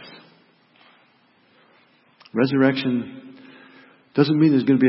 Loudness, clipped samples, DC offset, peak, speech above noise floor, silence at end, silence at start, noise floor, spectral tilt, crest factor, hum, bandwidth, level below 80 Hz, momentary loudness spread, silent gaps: -20 LUFS; under 0.1%; under 0.1%; -4 dBFS; 41 dB; 0 s; 0 s; -59 dBFS; -11.5 dB/octave; 20 dB; none; 5.8 kHz; -70 dBFS; 20 LU; none